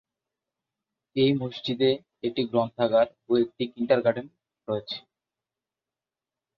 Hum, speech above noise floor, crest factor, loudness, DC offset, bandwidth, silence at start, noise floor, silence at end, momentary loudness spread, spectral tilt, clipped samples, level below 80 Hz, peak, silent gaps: none; over 65 dB; 20 dB; -26 LUFS; under 0.1%; 6.4 kHz; 1.15 s; under -90 dBFS; 1.6 s; 11 LU; -8 dB/octave; under 0.1%; -68 dBFS; -8 dBFS; none